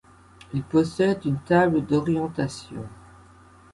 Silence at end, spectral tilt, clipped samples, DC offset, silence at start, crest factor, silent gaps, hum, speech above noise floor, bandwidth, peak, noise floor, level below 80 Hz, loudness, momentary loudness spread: 0.8 s; -7 dB/octave; under 0.1%; under 0.1%; 0.5 s; 20 dB; none; none; 28 dB; 11.5 kHz; -6 dBFS; -51 dBFS; -54 dBFS; -24 LUFS; 17 LU